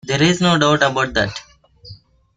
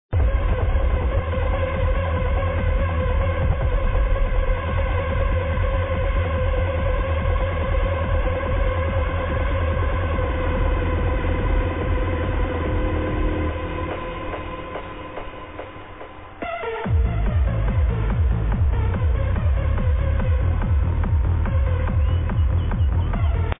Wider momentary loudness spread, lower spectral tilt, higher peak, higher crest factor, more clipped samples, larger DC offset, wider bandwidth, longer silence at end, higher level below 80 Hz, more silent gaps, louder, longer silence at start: about the same, 9 LU vs 7 LU; second, -4.5 dB/octave vs -11.5 dB/octave; first, -2 dBFS vs -8 dBFS; first, 18 dB vs 12 dB; neither; second, under 0.1% vs 0.5%; first, 9.4 kHz vs 3.8 kHz; first, 0.4 s vs 0 s; second, -44 dBFS vs -24 dBFS; neither; first, -16 LUFS vs -23 LUFS; about the same, 0.05 s vs 0.1 s